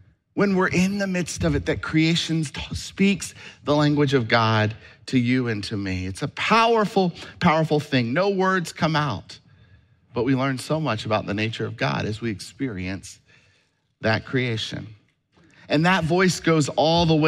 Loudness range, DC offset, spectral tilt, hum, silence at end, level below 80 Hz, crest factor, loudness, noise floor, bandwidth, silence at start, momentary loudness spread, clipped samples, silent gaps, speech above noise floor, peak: 6 LU; under 0.1%; -5.5 dB/octave; none; 0 s; -48 dBFS; 18 dB; -22 LUFS; -66 dBFS; 13.5 kHz; 0.35 s; 11 LU; under 0.1%; none; 43 dB; -6 dBFS